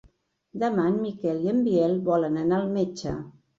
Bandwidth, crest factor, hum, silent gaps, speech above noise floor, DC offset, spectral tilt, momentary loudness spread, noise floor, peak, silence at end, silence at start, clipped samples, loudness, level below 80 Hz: 7.8 kHz; 14 dB; none; none; 37 dB; under 0.1%; -7.5 dB/octave; 10 LU; -62 dBFS; -12 dBFS; 0.3 s; 0.55 s; under 0.1%; -25 LUFS; -56 dBFS